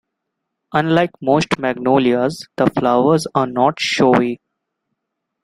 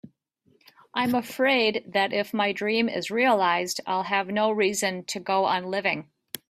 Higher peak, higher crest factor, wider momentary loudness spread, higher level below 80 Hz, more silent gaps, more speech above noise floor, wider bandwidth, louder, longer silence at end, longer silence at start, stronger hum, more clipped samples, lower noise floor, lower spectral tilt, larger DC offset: first, 0 dBFS vs -10 dBFS; about the same, 16 dB vs 16 dB; about the same, 6 LU vs 7 LU; first, -54 dBFS vs -70 dBFS; neither; first, 61 dB vs 41 dB; second, 12.5 kHz vs 16 kHz; first, -16 LUFS vs -25 LUFS; first, 1.05 s vs 0.15 s; first, 0.75 s vs 0.05 s; neither; neither; first, -77 dBFS vs -66 dBFS; first, -5.5 dB/octave vs -3.5 dB/octave; neither